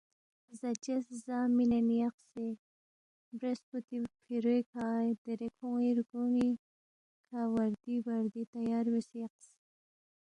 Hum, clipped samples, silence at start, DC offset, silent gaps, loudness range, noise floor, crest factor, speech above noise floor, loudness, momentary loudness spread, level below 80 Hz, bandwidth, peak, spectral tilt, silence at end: none; under 0.1%; 0.5 s; under 0.1%; 2.14-2.18 s, 2.59-3.32 s, 3.63-3.72 s, 3.84-3.88 s, 4.66-4.73 s, 5.18-5.25 s, 6.59-7.24 s, 8.47-8.53 s; 3 LU; under -90 dBFS; 14 dB; over 56 dB; -35 LUFS; 11 LU; -74 dBFS; 10 kHz; -22 dBFS; -6.5 dB/octave; 1 s